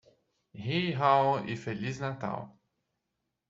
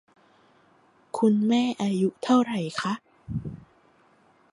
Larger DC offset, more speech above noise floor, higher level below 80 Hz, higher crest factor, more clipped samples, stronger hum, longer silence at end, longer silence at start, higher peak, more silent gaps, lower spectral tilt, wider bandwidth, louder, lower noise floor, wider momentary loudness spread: neither; first, 54 dB vs 37 dB; second, -70 dBFS vs -56 dBFS; about the same, 20 dB vs 20 dB; neither; neither; about the same, 1 s vs 0.95 s; second, 0.55 s vs 1.15 s; second, -12 dBFS vs -8 dBFS; neither; about the same, -6.5 dB/octave vs -6 dB/octave; second, 7.8 kHz vs 11.5 kHz; second, -30 LUFS vs -26 LUFS; first, -84 dBFS vs -61 dBFS; about the same, 16 LU vs 14 LU